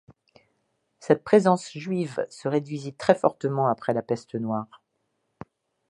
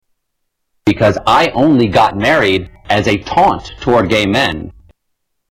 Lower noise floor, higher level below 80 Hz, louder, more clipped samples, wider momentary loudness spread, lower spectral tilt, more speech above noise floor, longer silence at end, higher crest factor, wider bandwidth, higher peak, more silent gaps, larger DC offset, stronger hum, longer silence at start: first, -76 dBFS vs -70 dBFS; second, -68 dBFS vs -38 dBFS; second, -25 LUFS vs -13 LUFS; neither; first, 11 LU vs 8 LU; first, -7 dB/octave vs -5.5 dB/octave; second, 51 dB vs 57 dB; first, 1.25 s vs 0.8 s; first, 22 dB vs 12 dB; second, 11 kHz vs 16.5 kHz; about the same, -4 dBFS vs -2 dBFS; neither; neither; neither; first, 1 s vs 0.85 s